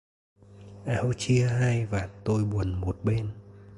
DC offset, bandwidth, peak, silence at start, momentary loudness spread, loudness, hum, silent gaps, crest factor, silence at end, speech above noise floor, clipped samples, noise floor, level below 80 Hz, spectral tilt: under 0.1%; 11.5 kHz; -14 dBFS; 0.5 s; 9 LU; -28 LUFS; none; none; 14 dB; 0 s; 21 dB; under 0.1%; -47 dBFS; -44 dBFS; -6.5 dB/octave